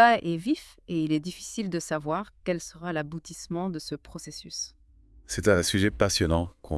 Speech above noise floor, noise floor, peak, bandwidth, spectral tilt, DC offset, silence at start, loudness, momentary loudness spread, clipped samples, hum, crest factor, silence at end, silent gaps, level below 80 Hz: 28 dB; -55 dBFS; -6 dBFS; 12 kHz; -4.5 dB/octave; under 0.1%; 0 s; -28 LUFS; 14 LU; under 0.1%; none; 22 dB; 0 s; none; -48 dBFS